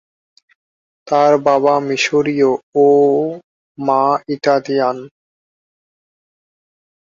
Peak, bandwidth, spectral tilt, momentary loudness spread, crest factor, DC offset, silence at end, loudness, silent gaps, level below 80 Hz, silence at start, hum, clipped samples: -2 dBFS; 7.4 kHz; -5 dB/octave; 8 LU; 16 dB; under 0.1%; 1.95 s; -15 LUFS; 2.63-2.72 s, 3.44-3.75 s; -64 dBFS; 1.05 s; none; under 0.1%